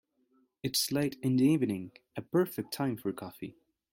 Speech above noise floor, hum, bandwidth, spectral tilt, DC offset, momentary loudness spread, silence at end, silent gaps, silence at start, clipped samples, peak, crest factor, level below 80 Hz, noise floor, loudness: 40 dB; none; 17 kHz; -5 dB/octave; under 0.1%; 17 LU; 0.4 s; none; 0.65 s; under 0.1%; -16 dBFS; 16 dB; -70 dBFS; -71 dBFS; -31 LUFS